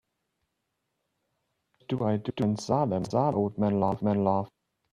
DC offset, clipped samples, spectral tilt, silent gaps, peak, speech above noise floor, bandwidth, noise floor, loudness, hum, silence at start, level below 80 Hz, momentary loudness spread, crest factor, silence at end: under 0.1%; under 0.1%; -8 dB/octave; none; -10 dBFS; 54 dB; 10 kHz; -81 dBFS; -28 LUFS; none; 1.9 s; -64 dBFS; 5 LU; 18 dB; 0.45 s